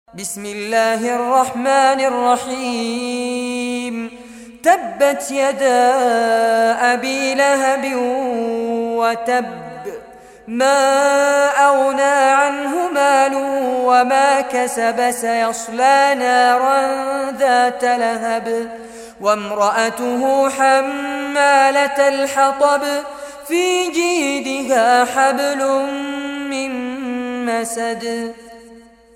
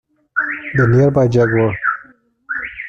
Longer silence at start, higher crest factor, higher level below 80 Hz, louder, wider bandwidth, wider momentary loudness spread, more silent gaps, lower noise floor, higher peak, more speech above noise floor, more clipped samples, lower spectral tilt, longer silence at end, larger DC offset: second, 0.15 s vs 0.35 s; about the same, 14 dB vs 14 dB; second, -60 dBFS vs -46 dBFS; about the same, -16 LUFS vs -16 LUFS; first, 16.5 kHz vs 7 kHz; about the same, 11 LU vs 12 LU; neither; about the same, -43 dBFS vs -46 dBFS; about the same, -2 dBFS vs -2 dBFS; second, 27 dB vs 33 dB; neither; second, -2 dB/octave vs -8.5 dB/octave; first, 0.35 s vs 0 s; neither